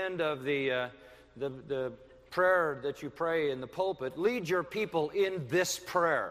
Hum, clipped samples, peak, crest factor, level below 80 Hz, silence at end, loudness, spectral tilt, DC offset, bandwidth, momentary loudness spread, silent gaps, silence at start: none; under 0.1%; -14 dBFS; 18 dB; -66 dBFS; 0 s; -32 LUFS; -4 dB/octave; under 0.1%; 15.5 kHz; 10 LU; none; 0 s